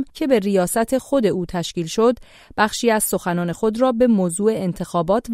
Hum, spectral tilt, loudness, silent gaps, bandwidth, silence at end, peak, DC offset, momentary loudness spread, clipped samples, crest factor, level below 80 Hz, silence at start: none; -5 dB/octave; -19 LUFS; none; 16 kHz; 0 s; -4 dBFS; under 0.1%; 7 LU; under 0.1%; 16 dB; -48 dBFS; 0 s